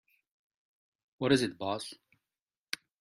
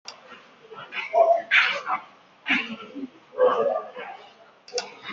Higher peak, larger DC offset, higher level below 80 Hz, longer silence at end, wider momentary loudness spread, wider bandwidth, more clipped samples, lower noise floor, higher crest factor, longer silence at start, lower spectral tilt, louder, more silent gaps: second, -10 dBFS vs -6 dBFS; neither; first, -70 dBFS vs -78 dBFS; first, 1.05 s vs 0 s; second, 13 LU vs 21 LU; first, 15 kHz vs 7.4 kHz; neither; first, under -90 dBFS vs -51 dBFS; first, 26 dB vs 20 dB; first, 1.2 s vs 0.05 s; first, -5 dB/octave vs 1 dB/octave; second, -32 LUFS vs -23 LUFS; neither